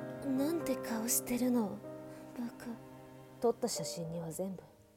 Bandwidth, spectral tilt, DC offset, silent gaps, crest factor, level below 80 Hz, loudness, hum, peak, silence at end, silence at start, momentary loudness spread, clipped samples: 17.5 kHz; -4.5 dB/octave; under 0.1%; none; 18 dB; -70 dBFS; -36 LUFS; none; -20 dBFS; 0.15 s; 0 s; 16 LU; under 0.1%